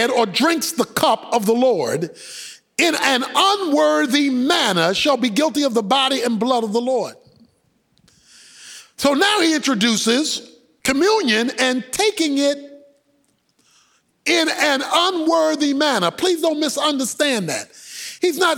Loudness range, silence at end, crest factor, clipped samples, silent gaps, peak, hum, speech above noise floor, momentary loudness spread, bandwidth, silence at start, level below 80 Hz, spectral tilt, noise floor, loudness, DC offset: 4 LU; 0 s; 16 dB; under 0.1%; none; -2 dBFS; none; 45 dB; 10 LU; 18.5 kHz; 0 s; -62 dBFS; -3 dB/octave; -63 dBFS; -18 LUFS; under 0.1%